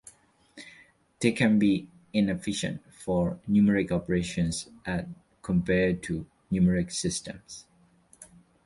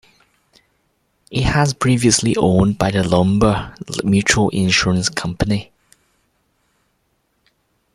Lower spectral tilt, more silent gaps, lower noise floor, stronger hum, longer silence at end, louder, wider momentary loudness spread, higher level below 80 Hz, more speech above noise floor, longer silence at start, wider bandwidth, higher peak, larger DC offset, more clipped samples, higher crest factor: about the same, -5.5 dB/octave vs -4.5 dB/octave; neither; second, -61 dBFS vs -66 dBFS; neither; second, 0.4 s vs 2.3 s; second, -27 LUFS vs -16 LUFS; first, 20 LU vs 8 LU; second, -50 dBFS vs -38 dBFS; second, 34 dB vs 50 dB; second, 0.55 s vs 1.3 s; second, 11.5 kHz vs 13 kHz; second, -8 dBFS vs 0 dBFS; neither; neither; about the same, 20 dB vs 18 dB